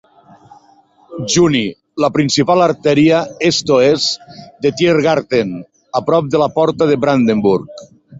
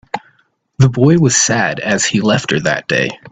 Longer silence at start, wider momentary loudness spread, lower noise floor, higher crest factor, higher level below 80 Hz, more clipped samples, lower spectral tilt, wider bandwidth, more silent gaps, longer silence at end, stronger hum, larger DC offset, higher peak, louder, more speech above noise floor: first, 1.1 s vs 0.15 s; first, 11 LU vs 6 LU; second, -50 dBFS vs -58 dBFS; about the same, 14 dB vs 14 dB; about the same, -52 dBFS vs -48 dBFS; neither; about the same, -5 dB/octave vs -4 dB/octave; second, 8 kHz vs 9.2 kHz; neither; about the same, 0 s vs 0.05 s; neither; neither; about the same, 0 dBFS vs 0 dBFS; about the same, -14 LUFS vs -13 LUFS; second, 36 dB vs 44 dB